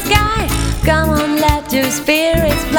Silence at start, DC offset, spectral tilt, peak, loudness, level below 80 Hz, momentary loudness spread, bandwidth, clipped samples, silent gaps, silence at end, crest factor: 0 s; under 0.1%; -4.5 dB/octave; 0 dBFS; -14 LUFS; -22 dBFS; 3 LU; over 20 kHz; under 0.1%; none; 0 s; 14 dB